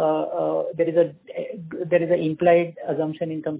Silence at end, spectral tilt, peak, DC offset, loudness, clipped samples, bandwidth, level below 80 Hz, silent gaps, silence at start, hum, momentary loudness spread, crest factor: 0 s; -11 dB/octave; -6 dBFS; under 0.1%; -23 LUFS; under 0.1%; 4 kHz; -66 dBFS; none; 0 s; none; 14 LU; 18 dB